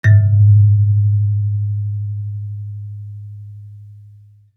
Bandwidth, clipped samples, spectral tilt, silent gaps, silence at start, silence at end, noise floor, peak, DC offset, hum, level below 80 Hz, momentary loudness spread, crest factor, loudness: 2.2 kHz; under 0.1%; -9 dB/octave; none; 0.05 s; 0.6 s; -44 dBFS; -2 dBFS; under 0.1%; none; -52 dBFS; 23 LU; 14 dB; -15 LUFS